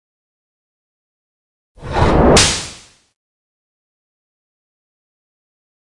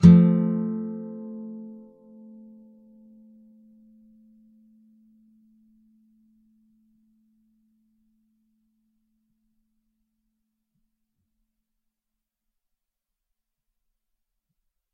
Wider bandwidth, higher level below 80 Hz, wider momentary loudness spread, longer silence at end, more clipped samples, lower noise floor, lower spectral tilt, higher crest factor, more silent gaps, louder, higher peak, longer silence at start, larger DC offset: first, 11.5 kHz vs 6 kHz; first, -30 dBFS vs -56 dBFS; second, 14 LU vs 31 LU; second, 3.25 s vs 13.25 s; neither; second, -39 dBFS vs -85 dBFS; second, -3.5 dB/octave vs -10 dB/octave; second, 20 dB vs 26 dB; neither; first, -13 LUFS vs -23 LUFS; about the same, 0 dBFS vs -2 dBFS; first, 1.8 s vs 0 s; neither